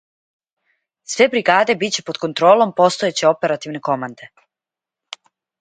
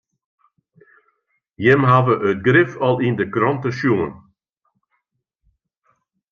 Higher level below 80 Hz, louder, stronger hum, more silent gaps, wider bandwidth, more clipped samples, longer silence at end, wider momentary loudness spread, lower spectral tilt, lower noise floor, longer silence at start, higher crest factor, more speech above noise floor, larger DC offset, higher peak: second, -68 dBFS vs -60 dBFS; about the same, -17 LUFS vs -17 LUFS; neither; neither; first, 9.6 kHz vs 6.8 kHz; neither; second, 1.35 s vs 2.15 s; first, 20 LU vs 6 LU; second, -3.5 dB/octave vs -8 dB/octave; first, -88 dBFS vs -74 dBFS; second, 1.1 s vs 1.6 s; about the same, 18 dB vs 18 dB; first, 71 dB vs 57 dB; neither; about the same, 0 dBFS vs -2 dBFS